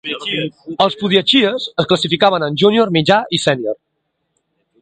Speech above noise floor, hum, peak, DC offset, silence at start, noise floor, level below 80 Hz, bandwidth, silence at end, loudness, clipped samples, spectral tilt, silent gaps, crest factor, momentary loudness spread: 55 dB; none; 0 dBFS; under 0.1%; 0.05 s; -71 dBFS; -56 dBFS; 9.4 kHz; 1.05 s; -15 LUFS; under 0.1%; -5 dB/octave; none; 16 dB; 9 LU